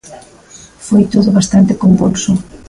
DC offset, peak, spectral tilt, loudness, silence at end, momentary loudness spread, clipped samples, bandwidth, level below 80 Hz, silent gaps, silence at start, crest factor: under 0.1%; 0 dBFS; -6.5 dB/octave; -11 LUFS; 0.1 s; 6 LU; under 0.1%; 11.5 kHz; -40 dBFS; none; 0.1 s; 12 dB